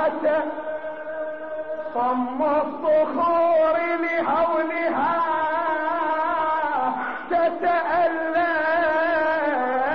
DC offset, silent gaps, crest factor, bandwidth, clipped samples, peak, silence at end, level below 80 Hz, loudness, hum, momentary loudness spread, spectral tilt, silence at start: 0.5%; none; 10 dB; 5.6 kHz; under 0.1%; -12 dBFS; 0 s; -60 dBFS; -22 LUFS; none; 10 LU; -2 dB/octave; 0 s